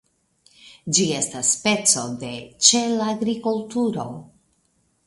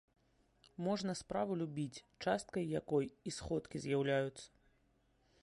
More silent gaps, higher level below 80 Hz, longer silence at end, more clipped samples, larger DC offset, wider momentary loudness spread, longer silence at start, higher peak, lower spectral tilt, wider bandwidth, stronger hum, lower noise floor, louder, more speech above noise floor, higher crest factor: neither; about the same, -64 dBFS vs -66 dBFS; about the same, 0.85 s vs 0.95 s; neither; neither; first, 17 LU vs 9 LU; second, 0.65 s vs 0.8 s; first, 0 dBFS vs -24 dBFS; second, -2.5 dB/octave vs -5.5 dB/octave; about the same, 11.5 kHz vs 11.5 kHz; neither; second, -66 dBFS vs -75 dBFS; first, -20 LUFS vs -40 LUFS; first, 45 dB vs 36 dB; first, 24 dB vs 18 dB